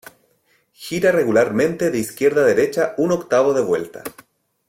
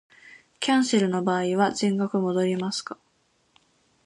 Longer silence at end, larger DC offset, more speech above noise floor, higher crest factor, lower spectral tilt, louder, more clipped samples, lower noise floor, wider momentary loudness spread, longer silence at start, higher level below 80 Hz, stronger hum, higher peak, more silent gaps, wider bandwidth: second, 0.6 s vs 1.1 s; neither; about the same, 44 dB vs 44 dB; about the same, 16 dB vs 18 dB; about the same, -5.5 dB/octave vs -5 dB/octave; first, -18 LUFS vs -24 LUFS; neither; second, -62 dBFS vs -67 dBFS; first, 14 LU vs 9 LU; first, 0.8 s vs 0.25 s; first, -58 dBFS vs -72 dBFS; neither; first, -4 dBFS vs -8 dBFS; neither; first, 16.5 kHz vs 11.5 kHz